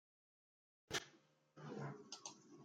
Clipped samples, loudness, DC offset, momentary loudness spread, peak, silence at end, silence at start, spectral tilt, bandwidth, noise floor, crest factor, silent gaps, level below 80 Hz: under 0.1%; -50 LUFS; under 0.1%; 14 LU; -30 dBFS; 0 s; 0.9 s; -3 dB/octave; 12 kHz; -73 dBFS; 24 dB; none; -84 dBFS